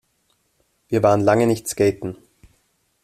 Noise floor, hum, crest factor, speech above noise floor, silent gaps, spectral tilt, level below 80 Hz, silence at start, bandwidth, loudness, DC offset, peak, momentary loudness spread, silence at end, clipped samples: -67 dBFS; none; 18 dB; 49 dB; none; -6 dB/octave; -56 dBFS; 0.9 s; 14.5 kHz; -19 LUFS; under 0.1%; -2 dBFS; 16 LU; 0.9 s; under 0.1%